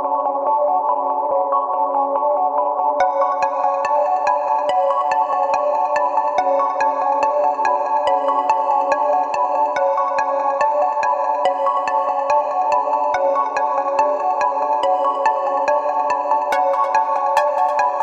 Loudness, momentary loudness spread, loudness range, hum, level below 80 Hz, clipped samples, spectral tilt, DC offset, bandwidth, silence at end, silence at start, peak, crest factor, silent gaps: -18 LUFS; 2 LU; 1 LU; none; -64 dBFS; under 0.1%; -3 dB/octave; under 0.1%; 9 kHz; 0 s; 0 s; -2 dBFS; 16 dB; none